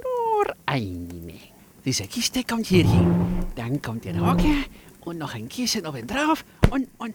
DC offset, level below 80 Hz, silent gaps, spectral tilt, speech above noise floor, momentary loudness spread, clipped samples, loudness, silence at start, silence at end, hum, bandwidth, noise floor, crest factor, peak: under 0.1%; -34 dBFS; none; -5.5 dB/octave; 25 dB; 15 LU; under 0.1%; -24 LUFS; 0 s; 0 s; none; 20 kHz; -48 dBFS; 20 dB; -4 dBFS